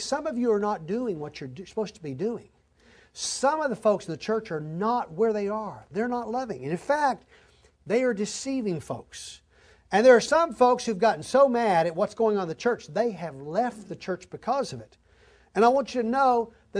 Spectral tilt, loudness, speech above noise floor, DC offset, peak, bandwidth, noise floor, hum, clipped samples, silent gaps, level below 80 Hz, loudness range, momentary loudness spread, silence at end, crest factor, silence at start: -4.5 dB/octave; -26 LUFS; 33 dB; under 0.1%; -6 dBFS; 11 kHz; -58 dBFS; none; under 0.1%; none; -62 dBFS; 7 LU; 14 LU; 0 s; 20 dB; 0 s